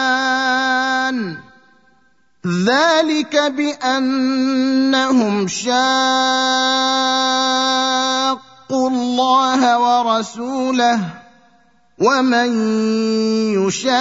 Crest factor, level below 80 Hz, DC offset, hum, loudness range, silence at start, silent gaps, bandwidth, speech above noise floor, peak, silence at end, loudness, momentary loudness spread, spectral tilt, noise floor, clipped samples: 14 dB; -66 dBFS; 0.1%; none; 3 LU; 0 s; none; 8 kHz; 43 dB; -2 dBFS; 0 s; -16 LUFS; 6 LU; -3.5 dB/octave; -59 dBFS; under 0.1%